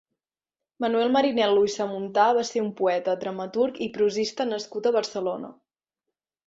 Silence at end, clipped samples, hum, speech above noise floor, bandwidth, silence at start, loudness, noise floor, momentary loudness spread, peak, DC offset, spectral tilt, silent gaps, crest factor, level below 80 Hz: 0.95 s; under 0.1%; none; over 66 dB; 7.8 kHz; 0.8 s; -25 LUFS; under -90 dBFS; 9 LU; -6 dBFS; under 0.1%; -4.5 dB/octave; none; 18 dB; -70 dBFS